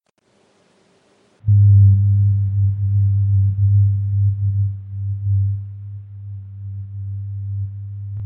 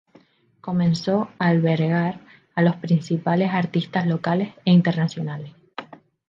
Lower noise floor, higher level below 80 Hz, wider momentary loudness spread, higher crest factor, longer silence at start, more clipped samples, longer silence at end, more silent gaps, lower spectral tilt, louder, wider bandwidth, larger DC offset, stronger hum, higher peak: first, -60 dBFS vs -56 dBFS; first, -46 dBFS vs -66 dBFS; about the same, 20 LU vs 18 LU; about the same, 14 dB vs 16 dB; first, 1.45 s vs 0.65 s; neither; second, 0 s vs 0.35 s; neither; first, -12 dB/octave vs -8 dB/octave; first, -18 LUFS vs -22 LUFS; second, 0.4 kHz vs 7.4 kHz; neither; neither; about the same, -4 dBFS vs -6 dBFS